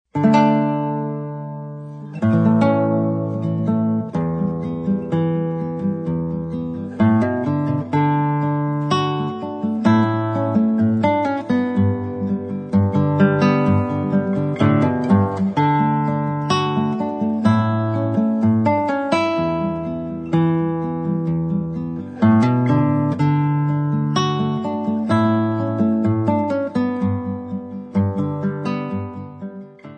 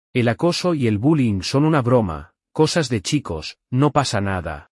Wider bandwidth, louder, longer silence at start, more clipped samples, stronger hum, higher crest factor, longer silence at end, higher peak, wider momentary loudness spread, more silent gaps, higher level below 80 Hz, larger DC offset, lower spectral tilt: second, 8.8 kHz vs 12 kHz; about the same, -19 LUFS vs -20 LUFS; about the same, 0.15 s vs 0.15 s; neither; neither; about the same, 18 dB vs 16 dB; second, 0 s vs 0.15 s; about the same, -2 dBFS vs -4 dBFS; about the same, 9 LU vs 9 LU; neither; second, -54 dBFS vs -48 dBFS; neither; first, -8.5 dB/octave vs -6 dB/octave